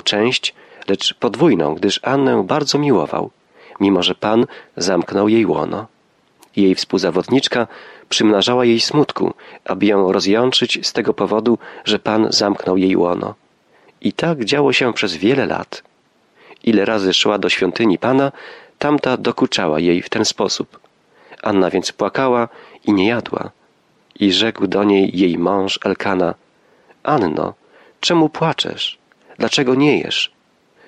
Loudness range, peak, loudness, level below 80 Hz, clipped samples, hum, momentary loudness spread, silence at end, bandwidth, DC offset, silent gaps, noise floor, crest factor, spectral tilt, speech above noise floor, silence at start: 3 LU; -2 dBFS; -17 LUFS; -58 dBFS; under 0.1%; none; 9 LU; 0.6 s; 11.5 kHz; under 0.1%; none; -57 dBFS; 14 dB; -4.5 dB/octave; 40 dB; 0.05 s